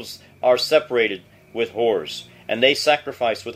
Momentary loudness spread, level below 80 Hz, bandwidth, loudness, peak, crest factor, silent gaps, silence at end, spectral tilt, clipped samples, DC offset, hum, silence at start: 16 LU; -64 dBFS; 16 kHz; -20 LUFS; -2 dBFS; 20 dB; none; 0 s; -3 dB/octave; under 0.1%; under 0.1%; none; 0 s